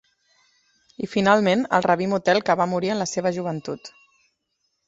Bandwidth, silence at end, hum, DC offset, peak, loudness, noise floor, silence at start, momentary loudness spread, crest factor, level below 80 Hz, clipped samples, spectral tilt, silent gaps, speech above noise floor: 8 kHz; 1 s; none; under 0.1%; -2 dBFS; -21 LUFS; -74 dBFS; 1 s; 13 LU; 20 dB; -62 dBFS; under 0.1%; -5 dB/octave; none; 53 dB